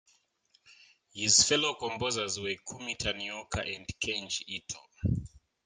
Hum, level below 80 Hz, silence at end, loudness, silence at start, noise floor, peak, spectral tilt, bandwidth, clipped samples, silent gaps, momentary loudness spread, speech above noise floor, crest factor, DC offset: none; -54 dBFS; 0.3 s; -30 LUFS; 0.7 s; -71 dBFS; -10 dBFS; -2 dB/octave; 11 kHz; under 0.1%; none; 15 LU; 39 dB; 24 dB; under 0.1%